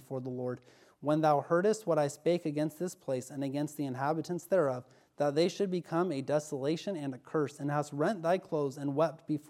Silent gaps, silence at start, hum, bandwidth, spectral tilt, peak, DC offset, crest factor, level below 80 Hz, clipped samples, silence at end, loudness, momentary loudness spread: none; 0.1 s; none; 16 kHz; -6.5 dB/octave; -14 dBFS; under 0.1%; 18 dB; -82 dBFS; under 0.1%; 0.1 s; -33 LUFS; 9 LU